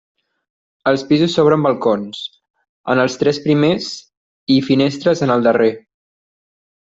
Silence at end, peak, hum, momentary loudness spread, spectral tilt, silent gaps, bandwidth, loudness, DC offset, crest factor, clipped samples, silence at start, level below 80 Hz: 1.2 s; -2 dBFS; none; 16 LU; -6 dB/octave; 2.50-2.54 s, 2.69-2.84 s, 4.17-4.47 s; 7.8 kHz; -16 LUFS; under 0.1%; 16 dB; under 0.1%; 0.85 s; -58 dBFS